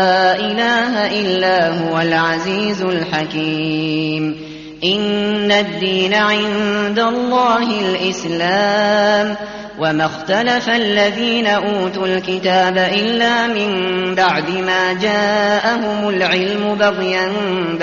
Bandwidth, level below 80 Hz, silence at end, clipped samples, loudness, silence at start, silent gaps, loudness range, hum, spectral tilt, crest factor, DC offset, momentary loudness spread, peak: 7.2 kHz; -52 dBFS; 0 s; under 0.1%; -16 LUFS; 0 s; none; 2 LU; none; -2.5 dB/octave; 14 dB; under 0.1%; 5 LU; -2 dBFS